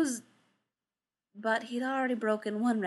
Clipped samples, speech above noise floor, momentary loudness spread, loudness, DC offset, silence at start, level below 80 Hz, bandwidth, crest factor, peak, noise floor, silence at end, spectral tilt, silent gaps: under 0.1%; over 59 dB; 5 LU; -32 LUFS; under 0.1%; 0 s; -88 dBFS; 12.5 kHz; 18 dB; -16 dBFS; under -90 dBFS; 0 s; -4.5 dB/octave; none